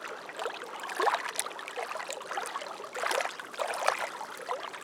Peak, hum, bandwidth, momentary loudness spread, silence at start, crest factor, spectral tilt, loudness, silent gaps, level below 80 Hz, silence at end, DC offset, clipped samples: -6 dBFS; none; 19.5 kHz; 9 LU; 0 s; 28 dB; 0 dB/octave; -34 LUFS; none; -86 dBFS; 0 s; under 0.1%; under 0.1%